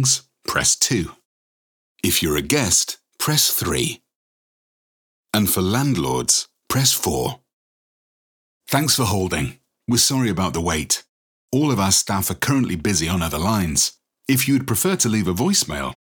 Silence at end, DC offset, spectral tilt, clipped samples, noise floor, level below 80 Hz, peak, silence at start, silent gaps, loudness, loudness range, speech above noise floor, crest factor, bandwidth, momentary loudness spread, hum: 0.15 s; under 0.1%; -3 dB/octave; under 0.1%; under -90 dBFS; -44 dBFS; -2 dBFS; 0 s; 1.25-1.96 s, 4.16-5.23 s, 7.53-8.60 s, 11.09-11.48 s; -19 LUFS; 2 LU; over 70 dB; 20 dB; over 20 kHz; 9 LU; none